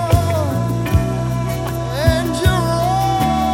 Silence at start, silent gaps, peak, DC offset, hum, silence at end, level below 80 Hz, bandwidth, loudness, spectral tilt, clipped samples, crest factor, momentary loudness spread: 0 s; none; 0 dBFS; under 0.1%; none; 0 s; -26 dBFS; 17 kHz; -18 LUFS; -6 dB/octave; under 0.1%; 16 dB; 5 LU